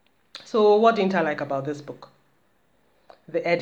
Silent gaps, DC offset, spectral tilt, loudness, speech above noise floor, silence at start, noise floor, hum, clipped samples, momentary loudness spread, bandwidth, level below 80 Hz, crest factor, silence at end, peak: none; under 0.1%; -6.5 dB/octave; -22 LUFS; 44 dB; 0.35 s; -66 dBFS; none; under 0.1%; 25 LU; 8 kHz; -76 dBFS; 20 dB; 0 s; -4 dBFS